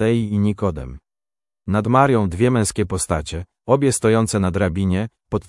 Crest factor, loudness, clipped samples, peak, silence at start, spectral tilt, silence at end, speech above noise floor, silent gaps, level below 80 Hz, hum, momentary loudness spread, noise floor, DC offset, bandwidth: 18 dB; -19 LUFS; under 0.1%; 0 dBFS; 0 s; -6 dB/octave; 0.05 s; over 72 dB; none; -42 dBFS; none; 12 LU; under -90 dBFS; under 0.1%; 12 kHz